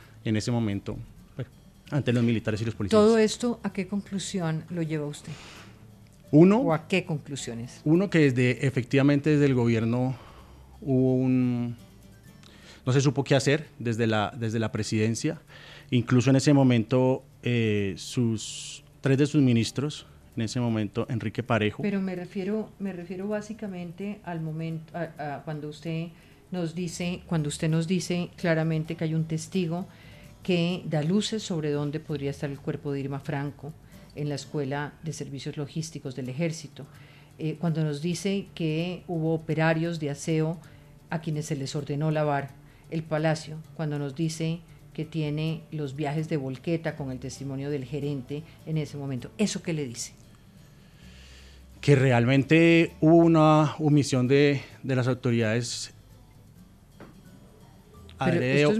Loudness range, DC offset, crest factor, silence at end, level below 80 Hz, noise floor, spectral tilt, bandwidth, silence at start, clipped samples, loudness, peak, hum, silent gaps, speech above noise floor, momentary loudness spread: 11 LU; under 0.1%; 20 dB; 0 s; -58 dBFS; -52 dBFS; -6.5 dB/octave; 13.5 kHz; 0 s; under 0.1%; -27 LUFS; -6 dBFS; none; none; 26 dB; 15 LU